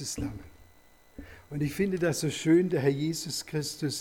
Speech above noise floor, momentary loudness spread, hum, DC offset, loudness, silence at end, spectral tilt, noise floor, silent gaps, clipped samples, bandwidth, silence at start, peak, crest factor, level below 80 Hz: 29 dB; 22 LU; none; under 0.1%; -29 LUFS; 0 s; -5 dB/octave; -58 dBFS; none; under 0.1%; 19 kHz; 0 s; -14 dBFS; 16 dB; -54 dBFS